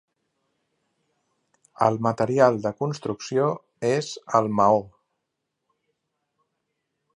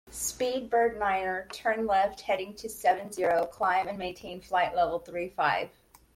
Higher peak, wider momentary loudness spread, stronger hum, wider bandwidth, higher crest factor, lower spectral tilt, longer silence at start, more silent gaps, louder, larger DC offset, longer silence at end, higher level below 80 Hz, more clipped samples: first, -4 dBFS vs -12 dBFS; about the same, 9 LU vs 9 LU; neither; second, 10.5 kHz vs 16.5 kHz; first, 22 dB vs 16 dB; first, -6 dB/octave vs -3 dB/octave; first, 1.8 s vs 0.05 s; neither; first, -23 LUFS vs -29 LUFS; neither; first, 2.3 s vs 0.5 s; second, -66 dBFS vs -58 dBFS; neither